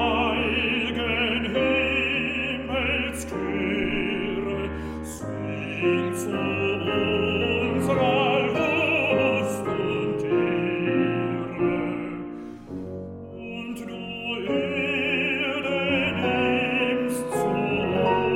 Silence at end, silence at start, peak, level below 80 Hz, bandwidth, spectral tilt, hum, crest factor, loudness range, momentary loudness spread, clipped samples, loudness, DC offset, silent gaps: 0 s; 0 s; -10 dBFS; -46 dBFS; 16.5 kHz; -5.5 dB/octave; none; 16 dB; 6 LU; 12 LU; under 0.1%; -24 LUFS; under 0.1%; none